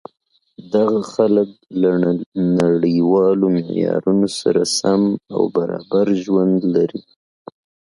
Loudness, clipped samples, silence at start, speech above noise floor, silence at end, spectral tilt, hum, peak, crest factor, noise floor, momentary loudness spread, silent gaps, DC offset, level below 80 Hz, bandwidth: -17 LUFS; under 0.1%; 0.6 s; 26 dB; 0.95 s; -6 dB/octave; none; -2 dBFS; 16 dB; -43 dBFS; 5 LU; 2.26-2.32 s; under 0.1%; -58 dBFS; 11.5 kHz